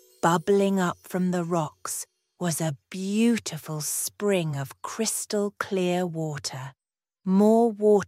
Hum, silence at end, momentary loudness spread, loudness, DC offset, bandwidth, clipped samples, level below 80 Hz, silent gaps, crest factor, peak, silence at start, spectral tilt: none; 0 s; 13 LU; -26 LUFS; under 0.1%; 16 kHz; under 0.1%; -72 dBFS; none; 20 dB; -6 dBFS; 0.25 s; -5 dB/octave